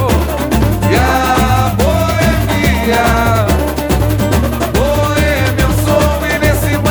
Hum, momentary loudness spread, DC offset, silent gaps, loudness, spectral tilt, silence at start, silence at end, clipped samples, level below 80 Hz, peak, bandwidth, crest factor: none; 3 LU; under 0.1%; none; -12 LUFS; -5.5 dB/octave; 0 s; 0 s; under 0.1%; -18 dBFS; 0 dBFS; over 20 kHz; 12 dB